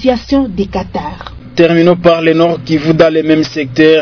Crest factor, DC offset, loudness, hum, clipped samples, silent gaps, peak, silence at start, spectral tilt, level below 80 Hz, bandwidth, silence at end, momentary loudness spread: 10 dB; 0.3%; -11 LUFS; none; 2%; none; 0 dBFS; 0 s; -7 dB/octave; -36 dBFS; 5.4 kHz; 0 s; 12 LU